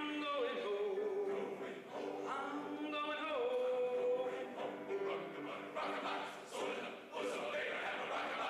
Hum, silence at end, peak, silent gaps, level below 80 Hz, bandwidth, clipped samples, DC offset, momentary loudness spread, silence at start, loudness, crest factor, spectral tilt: none; 0 s; -30 dBFS; none; -84 dBFS; 14.5 kHz; under 0.1%; under 0.1%; 8 LU; 0 s; -41 LUFS; 12 dB; -4 dB/octave